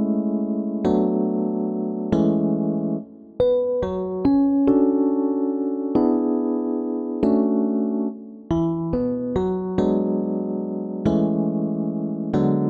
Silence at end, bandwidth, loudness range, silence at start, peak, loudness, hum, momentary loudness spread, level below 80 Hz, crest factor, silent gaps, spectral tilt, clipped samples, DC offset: 0 s; 6.4 kHz; 3 LU; 0 s; -6 dBFS; -22 LUFS; none; 7 LU; -48 dBFS; 14 dB; none; -10.5 dB/octave; under 0.1%; under 0.1%